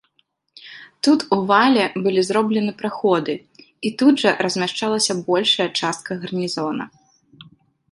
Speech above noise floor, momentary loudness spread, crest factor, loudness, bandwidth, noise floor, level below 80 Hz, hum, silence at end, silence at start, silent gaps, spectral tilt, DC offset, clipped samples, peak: 47 dB; 12 LU; 18 dB; -19 LUFS; 11.5 kHz; -66 dBFS; -66 dBFS; none; 0.5 s; 0.65 s; none; -4 dB/octave; under 0.1%; under 0.1%; -2 dBFS